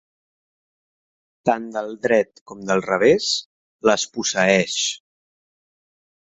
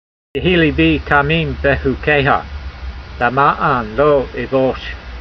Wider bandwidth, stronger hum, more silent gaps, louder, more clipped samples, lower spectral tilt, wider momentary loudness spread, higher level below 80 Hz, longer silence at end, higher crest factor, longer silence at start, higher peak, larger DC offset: first, 8.4 kHz vs 6.4 kHz; neither; first, 2.41-2.46 s, 3.46-3.79 s vs none; second, -20 LUFS vs -15 LUFS; neither; second, -3 dB/octave vs -8 dB/octave; second, 10 LU vs 16 LU; second, -60 dBFS vs -30 dBFS; first, 1.25 s vs 0 s; first, 22 dB vs 16 dB; first, 1.45 s vs 0.35 s; about the same, -2 dBFS vs 0 dBFS; neither